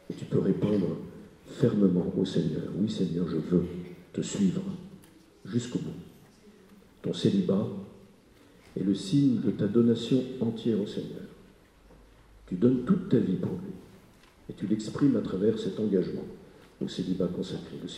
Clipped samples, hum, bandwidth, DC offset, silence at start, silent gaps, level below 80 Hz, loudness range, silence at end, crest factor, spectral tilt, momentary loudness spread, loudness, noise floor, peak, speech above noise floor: under 0.1%; none; 11.5 kHz; under 0.1%; 0.1 s; none; -60 dBFS; 5 LU; 0 s; 20 dB; -7.5 dB/octave; 18 LU; -29 LUFS; -57 dBFS; -10 dBFS; 29 dB